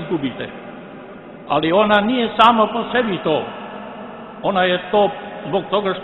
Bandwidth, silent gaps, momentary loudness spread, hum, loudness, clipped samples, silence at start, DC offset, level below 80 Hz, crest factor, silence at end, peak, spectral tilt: 11 kHz; none; 22 LU; none; -17 LUFS; under 0.1%; 0 s; under 0.1%; -54 dBFS; 18 dB; 0 s; 0 dBFS; -7 dB/octave